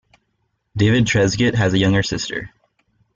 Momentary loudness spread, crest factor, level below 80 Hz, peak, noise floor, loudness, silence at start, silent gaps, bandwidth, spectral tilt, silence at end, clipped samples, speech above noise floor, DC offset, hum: 14 LU; 14 dB; -44 dBFS; -4 dBFS; -70 dBFS; -17 LUFS; 0.75 s; none; 7.8 kHz; -5.5 dB/octave; 0.7 s; under 0.1%; 53 dB; under 0.1%; none